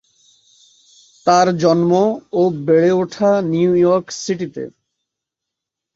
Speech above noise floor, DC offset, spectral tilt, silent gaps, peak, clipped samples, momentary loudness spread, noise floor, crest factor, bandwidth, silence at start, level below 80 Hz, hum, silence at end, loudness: 68 dB; under 0.1%; -6 dB/octave; none; 0 dBFS; under 0.1%; 10 LU; -83 dBFS; 18 dB; 7.8 kHz; 1.25 s; -60 dBFS; none; 1.25 s; -16 LUFS